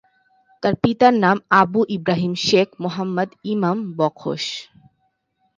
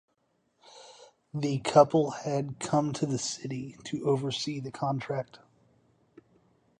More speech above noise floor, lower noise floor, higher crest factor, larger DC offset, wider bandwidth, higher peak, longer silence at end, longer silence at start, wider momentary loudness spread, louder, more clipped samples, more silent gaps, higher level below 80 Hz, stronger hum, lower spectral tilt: first, 50 dB vs 45 dB; second, -69 dBFS vs -74 dBFS; about the same, 20 dB vs 24 dB; neither; second, 9.4 kHz vs 10.5 kHz; first, 0 dBFS vs -8 dBFS; second, 0.95 s vs 1.45 s; second, 0.6 s vs 0.75 s; second, 10 LU vs 15 LU; first, -19 LUFS vs -29 LUFS; neither; neither; first, -58 dBFS vs -68 dBFS; neither; about the same, -5.5 dB/octave vs -5.5 dB/octave